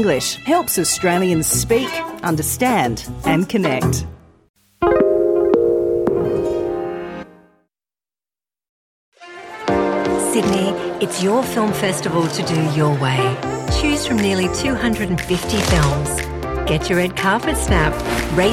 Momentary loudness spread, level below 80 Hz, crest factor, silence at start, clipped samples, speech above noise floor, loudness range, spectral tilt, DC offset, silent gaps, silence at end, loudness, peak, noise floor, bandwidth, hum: 7 LU; -34 dBFS; 16 dB; 0 s; under 0.1%; over 72 dB; 6 LU; -4.5 dB/octave; under 0.1%; 4.49-4.54 s, 8.69-9.12 s; 0 s; -18 LUFS; -2 dBFS; under -90 dBFS; 17 kHz; none